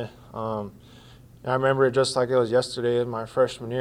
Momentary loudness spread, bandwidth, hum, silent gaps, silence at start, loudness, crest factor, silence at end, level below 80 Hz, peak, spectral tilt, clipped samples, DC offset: 13 LU; 12.5 kHz; none; none; 0 s; -24 LUFS; 16 dB; 0 s; -58 dBFS; -8 dBFS; -5.5 dB/octave; under 0.1%; under 0.1%